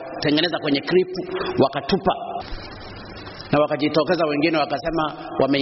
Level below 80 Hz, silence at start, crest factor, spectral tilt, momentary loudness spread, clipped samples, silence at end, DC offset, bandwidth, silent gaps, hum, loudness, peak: -46 dBFS; 0 s; 16 dB; -3.5 dB/octave; 16 LU; under 0.1%; 0 s; under 0.1%; 6 kHz; none; none; -21 LUFS; -6 dBFS